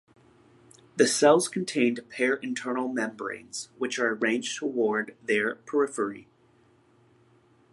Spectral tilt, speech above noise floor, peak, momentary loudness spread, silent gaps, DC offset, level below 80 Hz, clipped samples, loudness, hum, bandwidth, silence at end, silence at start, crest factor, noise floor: -3.5 dB/octave; 35 dB; -6 dBFS; 13 LU; none; under 0.1%; -76 dBFS; under 0.1%; -27 LUFS; none; 11.5 kHz; 1.5 s; 0.95 s; 22 dB; -62 dBFS